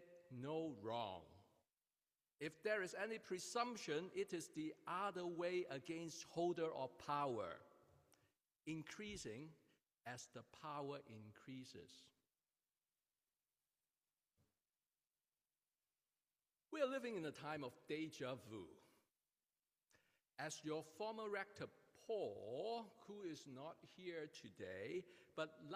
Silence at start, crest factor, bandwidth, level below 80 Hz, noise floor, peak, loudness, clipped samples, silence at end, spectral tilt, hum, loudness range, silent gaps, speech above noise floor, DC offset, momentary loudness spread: 0 s; 20 dB; 15.5 kHz; -86 dBFS; under -90 dBFS; -30 dBFS; -49 LUFS; under 0.1%; 0 s; -4.5 dB/octave; none; 10 LU; 15.07-15.11 s; over 41 dB; under 0.1%; 13 LU